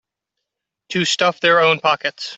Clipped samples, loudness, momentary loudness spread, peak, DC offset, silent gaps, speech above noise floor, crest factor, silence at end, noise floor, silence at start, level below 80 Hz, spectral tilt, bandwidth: under 0.1%; -16 LUFS; 7 LU; -2 dBFS; under 0.1%; none; 64 dB; 18 dB; 0 s; -81 dBFS; 0.9 s; -64 dBFS; -3 dB/octave; 8.4 kHz